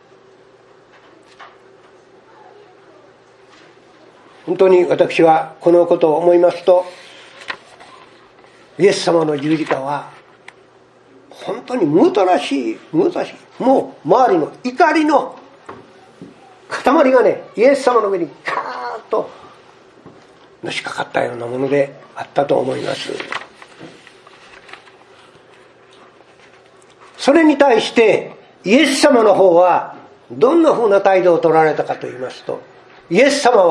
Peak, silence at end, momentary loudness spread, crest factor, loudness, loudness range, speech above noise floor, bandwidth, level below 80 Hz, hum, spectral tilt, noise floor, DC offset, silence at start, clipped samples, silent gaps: 0 dBFS; 0 s; 16 LU; 16 dB; -15 LUFS; 10 LU; 34 dB; 12 kHz; -66 dBFS; none; -5 dB/octave; -48 dBFS; under 0.1%; 1.4 s; under 0.1%; none